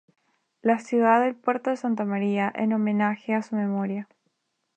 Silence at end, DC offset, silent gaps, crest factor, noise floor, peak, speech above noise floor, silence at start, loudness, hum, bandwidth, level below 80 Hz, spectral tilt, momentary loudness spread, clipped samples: 0.7 s; under 0.1%; none; 20 dB; -75 dBFS; -6 dBFS; 51 dB; 0.65 s; -25 LUFS; none; 8.6 kHz; -78 dBFS; -7.5 dB/octave; 8 LU; under 0.1%